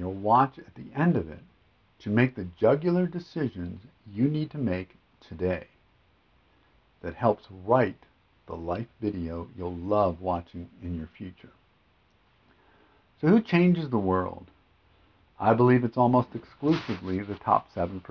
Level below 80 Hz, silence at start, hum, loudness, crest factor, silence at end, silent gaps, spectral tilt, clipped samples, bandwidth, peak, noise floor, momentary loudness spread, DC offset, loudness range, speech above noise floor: -50 dBFS; 0 s; none; -27 LUFS; 20 dB; 0.1 s; none; -9.5 dB/octave; under 0.1%; 6.2 kHz; -8 dBFS; -65 dBFS; 18 LU; under 0.1%; 7 LU; 38 dB